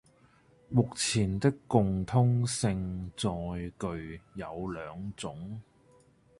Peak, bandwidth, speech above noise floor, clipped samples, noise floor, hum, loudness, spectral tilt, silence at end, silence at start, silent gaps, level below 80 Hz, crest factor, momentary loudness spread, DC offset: -10 dBFS; 11.5 kHz; 32 dB; under 0.1%; -63 dBFS; none; -31 LUFS; -5.5 dB/octave; 0.8 s; 0.7 s; none; -52 dBFS; 22 dB; 14 LU; under 0.1%